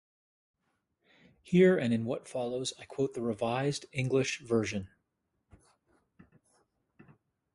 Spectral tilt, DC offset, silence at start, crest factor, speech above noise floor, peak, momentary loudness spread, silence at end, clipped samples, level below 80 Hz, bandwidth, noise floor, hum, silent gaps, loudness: -6 dB/octave; under 0.1%; 1.45 s; 20 dB; 51 dB; -12 dBFS; 12 LU; 2.7 s; under 0.1%; -66 dBFS; 11.5 kHz; -81 dBFS; none; none; -31 LUFS